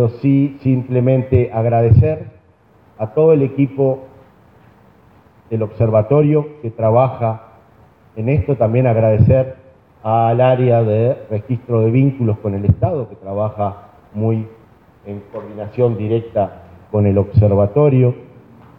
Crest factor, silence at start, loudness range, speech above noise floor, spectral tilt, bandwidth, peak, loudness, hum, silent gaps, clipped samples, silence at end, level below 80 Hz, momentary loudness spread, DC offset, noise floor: 14 dB; 0 s; 6 LU; 36 dB; -12 dB/octave; 3.9 kHz; -2 dBFS; -16 LUFS; none; none; under 0.1%; 0.55 s; -40 dBFS; 14 LU; under 0.1%; -51 dBFS